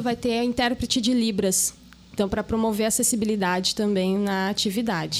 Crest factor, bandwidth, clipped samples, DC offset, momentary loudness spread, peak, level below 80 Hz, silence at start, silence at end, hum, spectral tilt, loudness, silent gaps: 16 dB; 16 kHz; under 0.1%; under 0.1%; 5 LU; -8 dBFS; -48 dBFS; 0 s; 0 s; none; -3.5 dB/octave; -23 LUFS; none